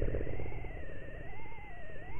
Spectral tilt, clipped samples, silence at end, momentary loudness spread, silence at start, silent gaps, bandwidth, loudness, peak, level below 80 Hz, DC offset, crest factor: -9 dB/octave; under 0.1%; 0 s; 10 LU; 0 s; none; 3.4 kHz; -45 LUFS; -20 dBFS; -42 dBFS; under 0.1%; 14 dB